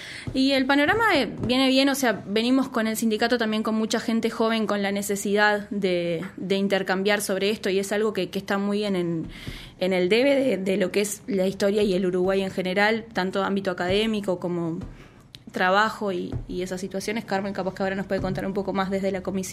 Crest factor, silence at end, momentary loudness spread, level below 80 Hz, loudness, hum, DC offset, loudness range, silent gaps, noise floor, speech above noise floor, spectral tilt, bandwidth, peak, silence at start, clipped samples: 18 dB; 0 s; 9 LU; -50 dBFS; -24 LUFS; none; under 0.1%; 5 LU; none; -46 dBFS; 23 dB; -4.5 dB/octave; 15.5 kHz; -6 dBFS; 0 s; under 0.1%